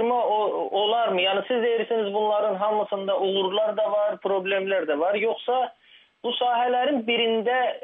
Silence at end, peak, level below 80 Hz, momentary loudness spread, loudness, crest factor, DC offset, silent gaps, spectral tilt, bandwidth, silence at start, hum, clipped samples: 0.05 s; -12 dBFS; -84 dBFS; 4 LU; -24 LUFS; 12 dB; under 0.1%; none; -7.5 dB/octave; 3.9 kHz; 0 s; none; under 0.1%